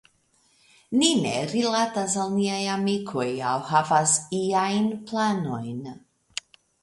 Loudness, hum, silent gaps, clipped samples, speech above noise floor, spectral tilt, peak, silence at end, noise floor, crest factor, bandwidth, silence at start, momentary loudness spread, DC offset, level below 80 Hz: -24 LUFS; none; none; under 0.1%; 40 dB; -3.5 dB/octave; -6 dBFS; 0.85 s; -65 dBFS; 20 dB; 11.5 kHz; 0.9 s; 15 LU; under 0.1%; -68 dBFS